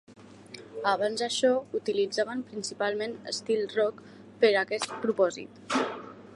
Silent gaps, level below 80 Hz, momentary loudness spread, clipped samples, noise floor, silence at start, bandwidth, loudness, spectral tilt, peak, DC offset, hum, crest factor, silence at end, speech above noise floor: none; -74 dBFS; 14 LU; under 0.1%; -48 dBFS; 0.1 s; 11.5 kHz; -29 LUFS; -3 dB/octave; -10 dBFS; under 0.1%; none; 20 dB; 0 s; 20 dB